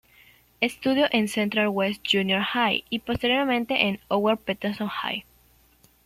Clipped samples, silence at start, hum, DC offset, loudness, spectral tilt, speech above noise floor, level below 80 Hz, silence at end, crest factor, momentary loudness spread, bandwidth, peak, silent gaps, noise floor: under 0.1%; 0.6 s; none; under 0.1%; -24 LUFS; -4.5 dB/octave; 35 dB; -56 dBFS; 0.85 s; 20 dB; 7 LU; 15.5 kHz; -6 dBFS; none; -59 dBFS